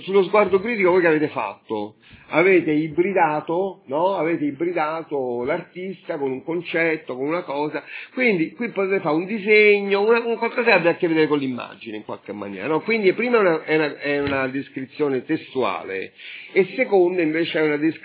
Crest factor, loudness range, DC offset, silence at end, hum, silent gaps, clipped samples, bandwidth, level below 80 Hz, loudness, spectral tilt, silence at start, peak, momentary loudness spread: 18 dB; 6 LU; under 0.1%; 0.05 s; none; none; under 0.1%; 4 kHz; -62 dBFS; -21 LUFS; -9.5 dB/octave; 0 s; -2 dBFS; 13 LU